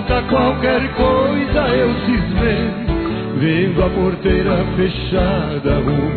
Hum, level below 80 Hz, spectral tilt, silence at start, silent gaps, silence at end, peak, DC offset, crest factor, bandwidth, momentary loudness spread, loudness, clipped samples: none; -26 dBFS; -10.5 dB/octave; 0 s; none; 0 s; -4 dBFS; under 0.1%; 12 dB; 4.6 kHz; 4 LU; -17 LUFS; under 0.1%